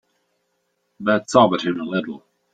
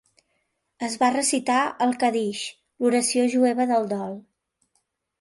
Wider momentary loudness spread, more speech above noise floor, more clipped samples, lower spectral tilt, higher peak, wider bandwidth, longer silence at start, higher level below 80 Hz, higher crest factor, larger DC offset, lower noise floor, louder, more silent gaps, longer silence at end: first, 16 LU vs 12 LU; about the same, 52 dB vs 51 dB; neither; first, -5.5 dB/octave vs -3 dB/octave; first, -2 dBFS vs -8 dBFS; second, 9.2 kHz vs 12 kHz; first, 1 s vs 0.8 s; first, -62 dBFS vs -72 dBFS; about the same, 20 dB vs 16 dB; neither; about the same, -71 dBFS vs -74 dBFS; first, -19 LUFS vs -23 LUFS; neither; second, 0.35 s vs 1 s